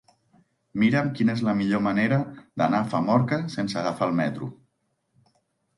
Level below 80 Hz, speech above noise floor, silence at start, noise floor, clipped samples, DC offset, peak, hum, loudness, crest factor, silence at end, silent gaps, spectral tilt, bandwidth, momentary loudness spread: -62 dBFS; 50 dB; 0.75 s; -74 dBFS; under 0.1%; under 0.1%; -8 dBFS; none; -24 LUFS; 18 dB; 1.25 s; none; -7.5 dB/octave; 11.5 kHz; 7 LU